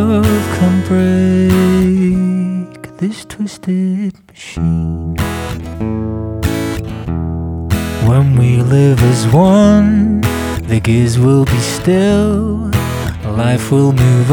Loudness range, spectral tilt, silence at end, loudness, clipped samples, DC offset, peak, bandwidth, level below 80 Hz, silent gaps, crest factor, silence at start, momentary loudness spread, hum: 8 LU; -7 dB/octave; 0 s; -13 LUFS; under 0.1%; under 0.1%; 0 dBFS; over 20 kHz; -32 dBFS; none; 12 dB; 0 s; 11 LU; none